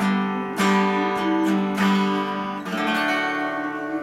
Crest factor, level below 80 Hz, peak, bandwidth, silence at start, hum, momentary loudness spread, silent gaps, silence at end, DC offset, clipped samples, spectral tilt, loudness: 16 dB; -64 dBFS; -8 dBFS; 14.5 kHz; 0 s; none; 7 LU; none; 0 s; under 0.1%; under 0.1%; -5.5 dB/octave; -22 LUFS